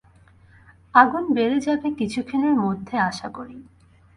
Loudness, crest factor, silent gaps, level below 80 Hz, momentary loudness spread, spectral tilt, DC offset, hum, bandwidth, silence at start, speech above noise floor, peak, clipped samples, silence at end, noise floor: -21 LUFS; 22 dB; none; -58 dBFS; 17 LU; -6 dB/octave; under 0.1%; none; 11.5 kHz; 0.95 s; 32 dB; 0 dBFS; under 0.1%; 0.55 s; -53 dBFS